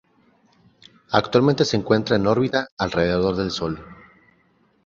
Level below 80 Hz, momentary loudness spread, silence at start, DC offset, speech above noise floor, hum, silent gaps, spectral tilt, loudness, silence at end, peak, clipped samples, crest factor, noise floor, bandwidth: -48 dBFS; 7 LU; 1.1 s; under 0.1%; 41 dB; none; 2.72-2.77 s; -6 dB/octave; -21 LUFS; 0.9 s; -2 dBFS; under 0.1%; 22 dB; -61 dBFS; 7.8 kHz